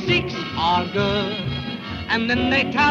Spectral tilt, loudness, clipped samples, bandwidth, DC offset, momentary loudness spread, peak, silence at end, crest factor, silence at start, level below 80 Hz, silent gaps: -5.5 dB/octave; -21 LUFS; under 0.1%; 7.6 kHz; under 0.1%; 9 LU; -6 dBFS; 0 s; 14 dB; 0 s; -42 dBFS; none